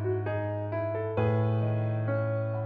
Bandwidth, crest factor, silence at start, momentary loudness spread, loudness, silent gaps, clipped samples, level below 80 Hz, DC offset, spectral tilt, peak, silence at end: 3.7 kHz; 14 dB; 0 s; 5 LU; -30 LUFS; none; under 0.1%; -58 dBFS; under 0.1%; -11 dB/octave; -16 dBFS; 0 s